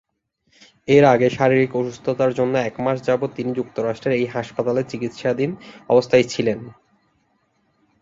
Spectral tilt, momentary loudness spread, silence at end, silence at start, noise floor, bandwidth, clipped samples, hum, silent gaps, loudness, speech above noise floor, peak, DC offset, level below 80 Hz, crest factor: -6.5 dB/octave; 10 LU; 1.3 s; 0.9 s; -67 dBFS; 7.8 kHz; under 0.1%; none; none; -20 LUFS; 48 dB; -2 dBFS; under 0.1%; -58 dBFS; 18 dB